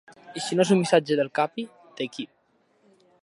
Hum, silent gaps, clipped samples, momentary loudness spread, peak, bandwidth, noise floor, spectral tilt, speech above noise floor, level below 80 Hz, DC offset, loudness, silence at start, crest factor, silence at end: none; none; under 0.1%; 19 LU; -4 dBFS; 11.5 kHz; -66 dBFS; -5 dB/octave; 42 dB; -78 dBFS; under 0.1%; -24 LUFS; 0.25 s; 22 dB; 1 s